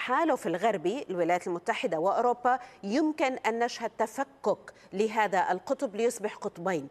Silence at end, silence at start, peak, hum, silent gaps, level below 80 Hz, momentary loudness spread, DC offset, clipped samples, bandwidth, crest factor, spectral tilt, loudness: 0 s; 0 s; -12 dBFS; none; none; -74 dBFS; 6 LU; under 0.1%; under 0.1%; 14.5 kHz; 18 dB; -4.5 dB/octave; -29 LUFS